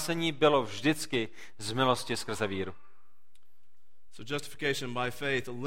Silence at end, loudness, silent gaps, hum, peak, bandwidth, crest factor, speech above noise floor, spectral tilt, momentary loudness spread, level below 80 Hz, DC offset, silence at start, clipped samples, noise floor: 0 s; -31 LUFS; none; none; -10 dBFS; 16.5 kHz; 22 dB; 42 dB; -4.5 dB/octave; 11 LU; -64 dBFS; 1%; 0 s; under 0.1%; -73 dBFS